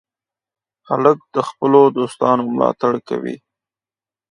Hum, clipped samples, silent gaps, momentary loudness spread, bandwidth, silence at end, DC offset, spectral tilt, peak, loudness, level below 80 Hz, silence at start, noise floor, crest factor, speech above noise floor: none; under 0.1%; none; 12 LU; 10.5 kHz; 0.95 s; under 0.1%; -7 dB/octave; 0 dBFS; -17 LUFS; -66 dBFS; 0.9 s; under -90 dBFS; 18 dB; over 74 dB